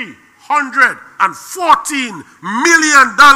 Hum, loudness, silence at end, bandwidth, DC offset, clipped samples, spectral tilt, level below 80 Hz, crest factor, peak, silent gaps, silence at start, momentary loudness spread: none; -11 LUFS; 0 s; 17 kHz; under 0.1%; 0.5%; -1 dB/octave; -52 dBFS; 12 dB; 0 dBFS; none; 0 s; 15 LU